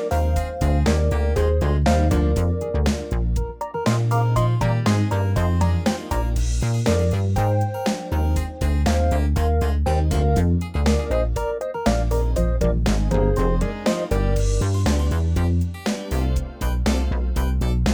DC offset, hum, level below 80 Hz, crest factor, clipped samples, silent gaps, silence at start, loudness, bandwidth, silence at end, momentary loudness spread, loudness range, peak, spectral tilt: under 0.1%; none; -24 dBFS; 14 dB; under 0.1%; none; 0 s; -22 LUFS; over 20 kHz; 0 s; 5 LU; 1 LU; -6 dBFS; -6.5 dB/octave